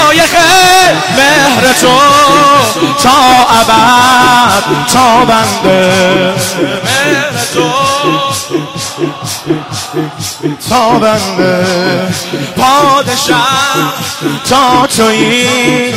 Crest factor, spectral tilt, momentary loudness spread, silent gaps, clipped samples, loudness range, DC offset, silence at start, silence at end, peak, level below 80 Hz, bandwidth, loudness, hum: 8 dB; -3 dB/octave; 11 LU; none; 0.2%; 7 LU; under 0.1%; 0 s; 0 s; 0 dBFS; -38 dBFS; 16.5 kHz; -7 LUFS; none